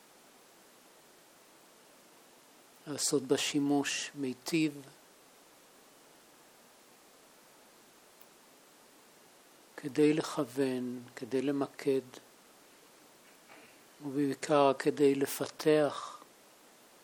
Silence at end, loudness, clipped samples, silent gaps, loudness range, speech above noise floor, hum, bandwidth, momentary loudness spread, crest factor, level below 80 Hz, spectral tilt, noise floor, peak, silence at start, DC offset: 0.8 s; -32 LUFS; under 0.1%; none; 9 LU; 29 dB; none; over 20 kHz; 24 LU; 22 dB; -86 dBFS; -4 dB/octave; -60 dBFS; -12 dBFS; 2.85 s; under 0.1%